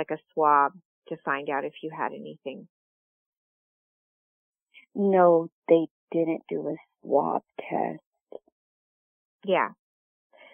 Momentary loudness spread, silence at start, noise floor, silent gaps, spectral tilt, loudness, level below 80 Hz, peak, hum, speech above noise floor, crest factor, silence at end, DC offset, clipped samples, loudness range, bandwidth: 18 LU; 0 s; under -90 dBFS; 0.85-1.02 s, 2.69-4.53 s, 4.62-4.66 s, 5.52-5.62 s, 5.91-6.08 s, 8.06-8.12 s, 8.21-8.26 s, 8.52-9.39 s; -10 dB/octave; -26 LUFS; -86 dBFS; -8 dBFS; none; over 64 dB; 22 dB; 0.8 s; under 0.1%; under 0.1%; 11 LU; 3.6 kHz